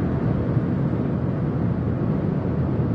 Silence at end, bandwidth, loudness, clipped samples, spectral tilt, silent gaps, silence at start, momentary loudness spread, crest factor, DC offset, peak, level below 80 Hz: 0 s; 5.2 kHz; -23 LUFS; under 0.1%; -11.5 dB/octave; none; 0 s; 1 LU; 12 dB; under 0.1%; -10 dBFS; -40 dBFS